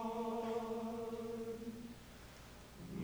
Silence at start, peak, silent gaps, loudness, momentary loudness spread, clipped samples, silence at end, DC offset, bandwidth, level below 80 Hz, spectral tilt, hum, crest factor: 0 s; -30 dBFS; none; -44 LUFS; 15 LU; under 0.1%; 0 s; under 0.1%; over 20 kHz; -64 dBFS; -6 dB/octave; none; 14 dB